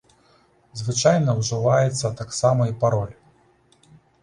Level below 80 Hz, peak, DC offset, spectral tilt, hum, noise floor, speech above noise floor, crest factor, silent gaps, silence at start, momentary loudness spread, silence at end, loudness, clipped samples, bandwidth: -54 dBFS; -4 dBFS; under 0.1%; -5.5 dB/octave; none; -59 dBFS; 38 dB; 18 dB; none; 0.75 s; 10 LU; 1.1 s; -21 LUFS; under 0.1%; 11 kHz